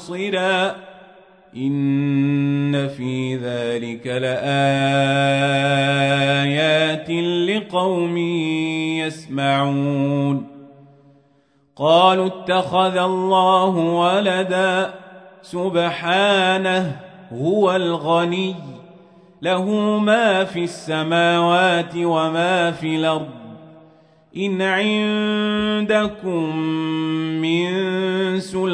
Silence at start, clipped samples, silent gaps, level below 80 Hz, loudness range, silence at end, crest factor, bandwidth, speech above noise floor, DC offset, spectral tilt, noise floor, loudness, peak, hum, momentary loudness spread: 0 s; under 0.1%; none; -62 dBFS; 4 LU; 0 s; 18 dB; 10.5 kHz; 40 dB; under 0.1%; -6 dB/octave; -59 dBFS; -19 LUFS; 0 dBFS; none; 9 LU